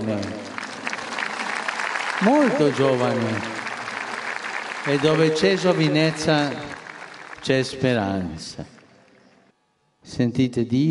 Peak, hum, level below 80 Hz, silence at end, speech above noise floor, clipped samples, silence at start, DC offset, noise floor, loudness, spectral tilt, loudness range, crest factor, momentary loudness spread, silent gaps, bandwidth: -4 dBFS; none; -58 dBFS; 0 s; 46 dB; under 0.1%; 0 s; under 0.1%; -67 dBFS; -22 LUFS; -5.5 dB/octave; 6 LU; 18 dB; 15 LU; none; 11.5 kHz